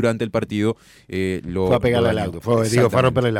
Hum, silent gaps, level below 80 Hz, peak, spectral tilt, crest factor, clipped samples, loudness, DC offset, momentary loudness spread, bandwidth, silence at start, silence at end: none; none; -44 dBFS; -6 dBFS; -6.5 dB/octave; 12 dB; under 0.1%; -20 LUFS; under 0.1%; 8 LU; 16 kHz; 0 s; 0 s